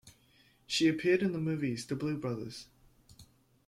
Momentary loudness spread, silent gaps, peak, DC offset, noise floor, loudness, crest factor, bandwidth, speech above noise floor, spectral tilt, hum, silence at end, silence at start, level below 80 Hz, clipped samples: 12 LU; none; -18 dBFS; under 0.1%; -66 dBFS; -32 LUFS; 18 dB; 14.5 kHz; 34 dB; -5 dB/octave; none; 0.45 s; 0.05 s; -68 dBFS; under 0.1%